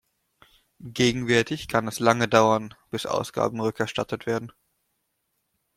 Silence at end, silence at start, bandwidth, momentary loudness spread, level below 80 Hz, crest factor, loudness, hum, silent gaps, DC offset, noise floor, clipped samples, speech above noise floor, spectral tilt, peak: 1.25 s; 0.8 s; 16 kHz; 12 LU; -58 dBFS; 24 dB; -24 LUFS; none; none; under 0.1%; -76 dBFS; under 0.1%; 52 dB; -4.5 dB/octave; -2 dBFS